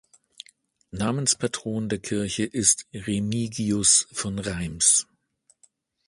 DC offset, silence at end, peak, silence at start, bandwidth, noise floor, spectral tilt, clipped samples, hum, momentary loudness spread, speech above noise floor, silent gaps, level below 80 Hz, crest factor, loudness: under 0.1%; 1.05 s; -4 dBFS; 0.95 s; 11.5 kHz; -65 dBFS; -3 dB/octave; under 0.1%; none; 12 LU; 41 dB; none; -52 dBFS; 24 dB; -23 LUFS